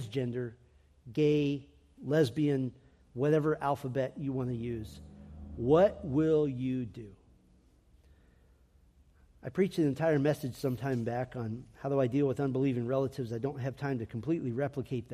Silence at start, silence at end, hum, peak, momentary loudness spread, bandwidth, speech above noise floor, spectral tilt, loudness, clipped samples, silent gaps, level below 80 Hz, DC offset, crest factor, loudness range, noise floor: 0 s; 0 s; none; -14 dBFS; 13 LU; 14.5 kHz; 33 dB; -8 dB/octave; -32 LUFS; under 0.1%; none; -60 dBFS; under 0.1%; 18 dB; 4 LU; -64 dBFS